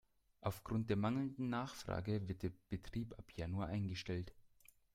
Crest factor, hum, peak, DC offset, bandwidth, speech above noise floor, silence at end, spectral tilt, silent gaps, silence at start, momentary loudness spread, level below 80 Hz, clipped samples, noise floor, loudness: 20 dB; none; -24 dBFS; under 0.1%; 16 kHz; 27 dB; 0.5 s; -7 dB/octave; none; 0.4 s; 9 LU; -62 dBFS; under 0.1%; -69 dBFS; -43 LUFS